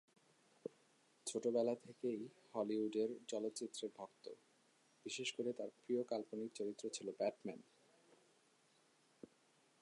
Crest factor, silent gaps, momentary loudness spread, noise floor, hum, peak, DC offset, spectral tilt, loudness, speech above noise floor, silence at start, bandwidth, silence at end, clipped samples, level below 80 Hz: 20 dB; none; 18 LU; -75 dBFS; none; -26 dBFS; under 0.1%; -4 dB/octave; -44 LUFS; 31 dB; 0.65 s; 11 kHz; 0.55 s; under 0.1%; under -90 dBFS